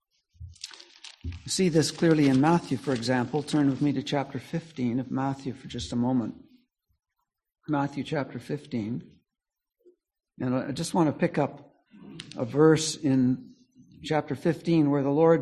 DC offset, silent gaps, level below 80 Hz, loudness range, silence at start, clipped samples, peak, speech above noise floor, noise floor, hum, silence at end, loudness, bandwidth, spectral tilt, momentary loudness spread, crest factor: under 0.1%; none; -56 dBFS; 9 LU; 0.4 s; under 0.1%; -8 dBFS; 62 dB; -88 dBFS; none; 0 s; -27 LUFS; 12.5 kHz; -6 dB/octave; 18 LU; 20 dB